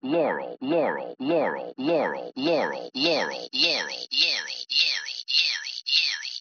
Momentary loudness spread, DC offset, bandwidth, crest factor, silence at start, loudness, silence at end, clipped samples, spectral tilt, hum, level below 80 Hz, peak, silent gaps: 7 LU; under 0.1%; 7 kHz; 20 dB; 0.05 s; -24 LUFS; 0 s; under 0.1%; -0.5 dB/octave; none; under -90 dBFS; -6 dBFS; none